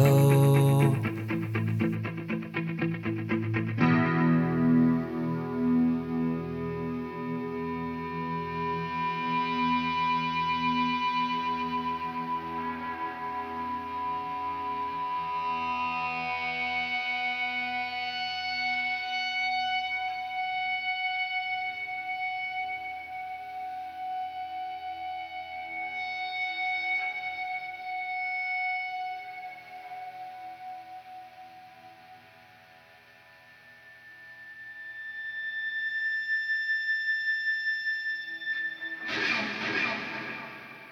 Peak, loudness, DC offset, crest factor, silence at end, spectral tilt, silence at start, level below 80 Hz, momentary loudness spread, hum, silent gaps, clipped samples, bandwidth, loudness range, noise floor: -12 dBFS; -29 LUFS; under 0.1%; 20 dB; 0 s; -6.5 dB/octave; 0 s; -62 dBFS; 13 LU; none; none; under 0.1%; 15.5 kHz; 12 LU; -55 dBFS